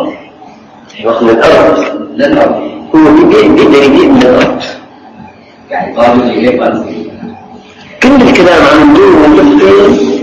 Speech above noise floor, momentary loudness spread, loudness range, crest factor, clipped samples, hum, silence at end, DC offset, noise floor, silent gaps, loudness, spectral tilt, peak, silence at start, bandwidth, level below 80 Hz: 28 dB; 15 LU; 6 LU; 6 dB; 5%; none; 0 s; under 0.1%; -33 dBFS; none; -5 LUFS; -6 dB/octave; 0 dBFS; 0 s; 9 kHz; -34 dBFS